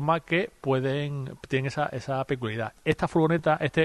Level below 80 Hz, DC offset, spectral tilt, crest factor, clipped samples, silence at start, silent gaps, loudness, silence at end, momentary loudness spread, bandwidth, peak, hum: -56 dBFS; under 0.1%; -7 dB/octave; 16 dB; under 0.1%; 0 s; none; -27 LUFS; 0 s; 7 LU; 12.5 kHz; -10 dBFS; none